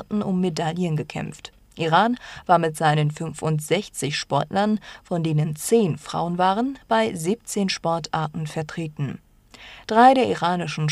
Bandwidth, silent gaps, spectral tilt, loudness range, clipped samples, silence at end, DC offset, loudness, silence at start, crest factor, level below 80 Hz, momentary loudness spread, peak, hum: 14 kHz; none; -5.5 dB/octave; 2 LU; under 0.1%; 0 s; under 0.1%; -23 LUFS; 0 s; 18 dB; -56 dBFS; 12 LU; -4 dBFS; none